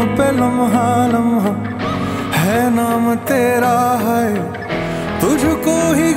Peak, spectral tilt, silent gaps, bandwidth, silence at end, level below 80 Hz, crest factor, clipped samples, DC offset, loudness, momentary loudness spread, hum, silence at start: -2 dBFS; -5.5 dB/octave; none; 16.5 kHz; 0 s; -40 dBFS; 12 dB; under 0.1%; under 0.1%; -16 LUFS; 7 LU; none; 0 s